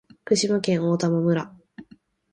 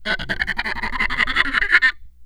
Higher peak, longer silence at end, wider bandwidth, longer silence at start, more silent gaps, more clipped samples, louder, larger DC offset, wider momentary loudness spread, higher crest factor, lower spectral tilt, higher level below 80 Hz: second, -8 dBFS vs 0 dBFS; first, 0.5 s vs 0 s; second, 10 kHz vs 12 kHz; first, 0.25 s vs 0 s; neither; neither; second, -23 LUFS vs -18 LUFS; neither; second, 5 LU vs 8 LU; about the same, 16 dB vs 20 dB; first, -5.5 dB/octave vs -3 dB/octave; second, -64 dBFS vs -34 dBFS